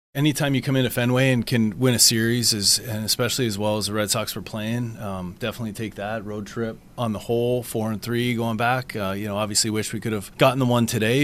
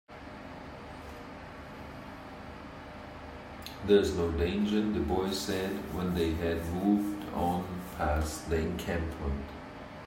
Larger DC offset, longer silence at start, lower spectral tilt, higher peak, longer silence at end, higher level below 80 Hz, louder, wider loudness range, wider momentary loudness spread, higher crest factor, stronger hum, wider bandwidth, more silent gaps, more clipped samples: first, 0.1% vs under 0.1%; about the same, 0.15 s vs 0.1 s; second, -4 dB/octave vs -6 dB/octave; first, -4 dBFS vs -12 dBFS; about the same, 0 s vs 0 s; second, -52 dBFS vs -46 dBFS; first, -22 LUFS vs -31 LUFS; second, 8 LU vs 15 LU; second, 12 LU vs 16 LU; about the same, 20 dB vs 22 dB; neither; about the same, 16 kHz vs 16 kHz; neither; neither